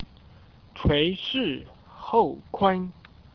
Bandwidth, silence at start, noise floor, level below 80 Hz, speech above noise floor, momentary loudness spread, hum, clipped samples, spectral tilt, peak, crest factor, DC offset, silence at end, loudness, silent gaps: 5.4 kHz; 0 s; -51 dBFS; -42 dBFS; 27 dB; 15 LU; none; under 0.1%; -8 dB/octave; -6 dBFS; 20 dB; under 0.1%; 0.45 s; -25 LUFS; none